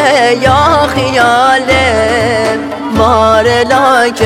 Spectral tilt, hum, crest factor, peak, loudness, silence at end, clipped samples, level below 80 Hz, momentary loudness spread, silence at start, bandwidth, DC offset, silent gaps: -4.5 dB/octave; none; 8 dB; 0 dBFS; -9 LUFS; 0 s; 0.5%; -34 dBFS; 4 LU; 0 s; 16.5 kHz; under 0.1%; none